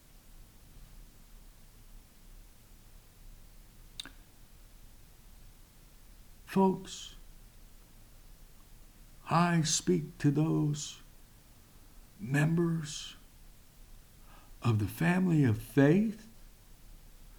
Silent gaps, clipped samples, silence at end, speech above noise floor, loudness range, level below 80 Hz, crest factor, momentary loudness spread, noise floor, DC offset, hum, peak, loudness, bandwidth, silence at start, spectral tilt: none; under 0.1%; 0.15 s; 28 dB; 22 LU; -56 dBFS; 22 dB; 20 LU; -57 dBFS; under 0.1%; none; -12 dBFS; -30 LUFS; over 20 kHz; 0.35 s; -5.5 dB/octave